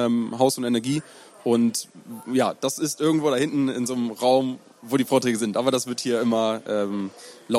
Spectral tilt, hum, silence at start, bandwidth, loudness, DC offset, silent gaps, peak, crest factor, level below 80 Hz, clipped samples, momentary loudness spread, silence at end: -4.5 dB/octave; none; 0 s; 16 kHz; -23 LUFS; under 0.1%; none; -6 dBFS; 18 dB; -70 dBFS; under 0.1%; 10 LU; 0 s